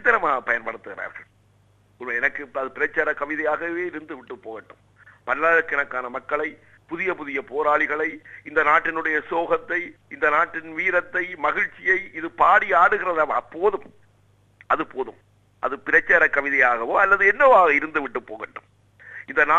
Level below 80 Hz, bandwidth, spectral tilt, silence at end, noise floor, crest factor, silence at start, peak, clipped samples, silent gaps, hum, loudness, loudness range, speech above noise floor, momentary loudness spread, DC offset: -56 dBFS; 7.6 kHz; -5 dB/octave; 0 s; -59 dBFS; 20 dB; 0 s; -4 dBFS; under 0.1%; none; 50 Hz at -60 dBFS; -21 LUFS; 8 LU; 37 dB; 19 LU; under 0.1%